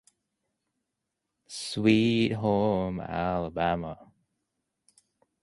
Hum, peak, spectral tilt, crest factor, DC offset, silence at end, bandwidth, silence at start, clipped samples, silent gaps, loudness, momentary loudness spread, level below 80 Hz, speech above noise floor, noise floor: none; -10 dBFS; -6 dB/octave; 20 dB; under 0.1%; 1.4 s; 11.5 kHz; 1.5 s; under 0.1%; none; -27 LUFS; 16 LU; -54 dBFS; 58 dB; -84 dBFS